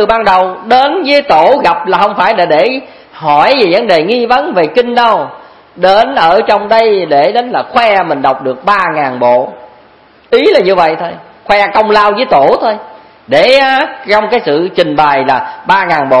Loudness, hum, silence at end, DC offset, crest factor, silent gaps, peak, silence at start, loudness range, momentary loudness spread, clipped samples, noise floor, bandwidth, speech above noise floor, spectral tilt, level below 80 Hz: -9 LUFS; none; 0 s; 0.3%; 10 dB; none; 0 dBFS; 0 s; 2 LU; 6 LU; 1%; -42 dBFS; 11 kHz; 33 dB; -5.5 dB/octave; -44 dBFS